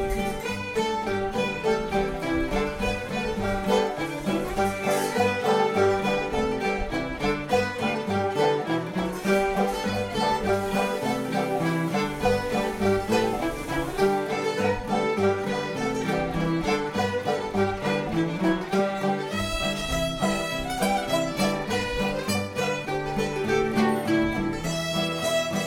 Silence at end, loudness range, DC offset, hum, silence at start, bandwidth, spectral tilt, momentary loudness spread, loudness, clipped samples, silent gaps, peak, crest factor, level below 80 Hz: 0 s; 2 LU; under 0.1%; none; 0 s; 16.5 kHz; -5 dB/octave; 4 LU; -26 LUFS; under 0.1%; none; -8 dBFS; 16 dB; -42 dBFS